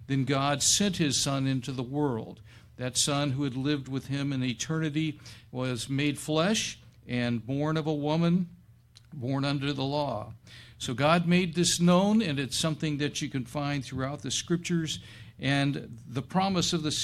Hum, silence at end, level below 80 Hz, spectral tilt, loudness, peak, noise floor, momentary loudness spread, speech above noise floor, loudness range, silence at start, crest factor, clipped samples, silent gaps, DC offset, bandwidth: none; 0 s; -58 dBFS; -4.5 dB/octave; -28 LUFS; -8 dBFS; -56 dBFS; 13 LU; 28 dB; 4 LU; 0 s; 20 dB; under 0.1%; none; under 0.1%; 14 kHz